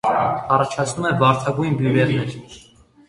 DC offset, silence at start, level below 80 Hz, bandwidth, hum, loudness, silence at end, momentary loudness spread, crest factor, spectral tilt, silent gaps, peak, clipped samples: under 0.1%; 0.05 s; -52 dBFS; 11.5 kHz; none; -19 LUFS; 0.5 s; 7 LU; 20 dB; -6 dB/octave; none; 0 dBFS; under 0.1%